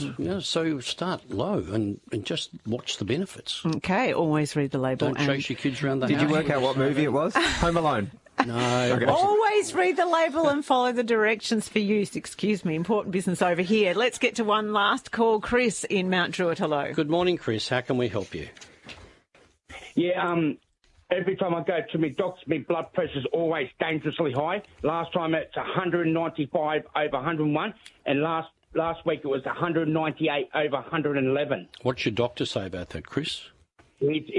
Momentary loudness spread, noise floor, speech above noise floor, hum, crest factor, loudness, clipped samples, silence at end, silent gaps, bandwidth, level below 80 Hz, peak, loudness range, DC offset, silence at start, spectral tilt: 8 LU; -61 dBFS; 35 dB; none; 22 dB; -26 LUFS; under 0.1%; 0 s; none; 11.5 kHz; -54 dBFS; -4 dBFS; 6 LU; under 0.1%; 0 s; -5.5 dB/octave